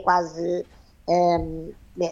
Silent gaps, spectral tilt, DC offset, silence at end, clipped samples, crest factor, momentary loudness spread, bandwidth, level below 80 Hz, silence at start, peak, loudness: none; -6 dB/octave; under 0.1%; 0 s; under 0.1%; 18 dB; 18 LU; 7.6 kHz; -46 dBFS; 0 s; -6 dBFS; -24 LUFS